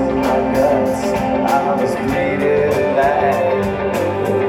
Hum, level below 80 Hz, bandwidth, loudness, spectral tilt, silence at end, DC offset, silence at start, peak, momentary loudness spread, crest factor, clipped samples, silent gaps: none; -38 dBFS; 18.5 kHz; -16 LUFS; -6.5 dB/octave; 0 s; under 0.1%; 0 s; -2 dBFS; 4 LU; 14 dB; under 0.1%; none